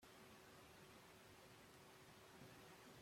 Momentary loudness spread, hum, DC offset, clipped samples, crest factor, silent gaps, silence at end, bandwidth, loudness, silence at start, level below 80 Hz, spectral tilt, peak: 2 LU; none; under 0.1%; under 0.1%; 14 dB; none; 0 s; 16.5 kHz; -64 LUFS; 0 s; -84 dBFS; -3.5 dB/octave; -50 dBFS